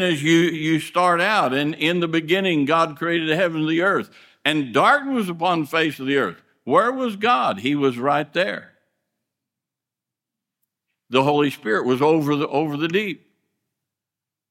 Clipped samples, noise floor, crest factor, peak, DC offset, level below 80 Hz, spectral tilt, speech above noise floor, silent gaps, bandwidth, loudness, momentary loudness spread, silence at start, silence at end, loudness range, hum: under 0.1%; -87 dBFS; 20 dB; -2 dBFS; under 0.1%; -70 dBFS; -5.5 dB/octave; 67 dB; none; 16 kHz; -20 LUFS; 6 LU; 0 s; 1.35 s; 6 LU; none